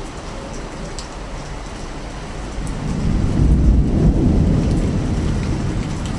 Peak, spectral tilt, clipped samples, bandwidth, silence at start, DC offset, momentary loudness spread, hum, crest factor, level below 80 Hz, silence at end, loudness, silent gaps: -2 dBFS; -7 dB/octave; under 0.1%; 11 kHz; 0 s; under 0.1%; 15 LU; none; 16 dB; -22 dBFS; 0 s; -20 LUFS; none